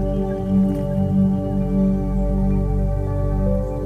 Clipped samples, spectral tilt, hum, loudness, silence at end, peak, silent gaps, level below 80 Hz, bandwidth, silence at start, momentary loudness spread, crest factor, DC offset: under 0.1%; -10.5 dB/octave; none; -21 LUFS; 0 s; -8 dBFS; none; -26 dBFS; 3.4 kHz; 0 s; 4 LU; 10 dB; under 0.1%